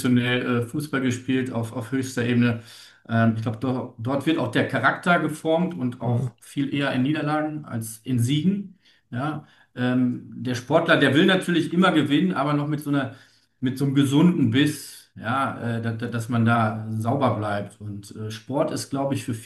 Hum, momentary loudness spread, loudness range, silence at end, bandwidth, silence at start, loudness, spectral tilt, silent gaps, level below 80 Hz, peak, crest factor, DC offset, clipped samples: none; 12 LU; 5 LU; 0 s; 12.5 kHz; 0 s; -23 LUFS; -6 dB/octave; none; -64 dBFS; -4 dBFS; 20 dB; under 0.1%; under 0.1%